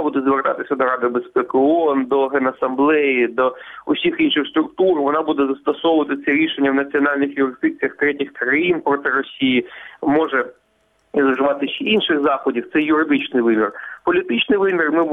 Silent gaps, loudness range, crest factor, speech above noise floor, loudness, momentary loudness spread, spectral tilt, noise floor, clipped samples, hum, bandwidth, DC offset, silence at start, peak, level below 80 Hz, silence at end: none; 2 LU; 14 dB; 44 dB; -18 LUFS; 5 LU; -7.5 dB/octave; -62 dBFS; under 0.1%; none; 3.9 kHz; under 0.1%; 0 s; -4 dBFS; -60 dBFS; 0 s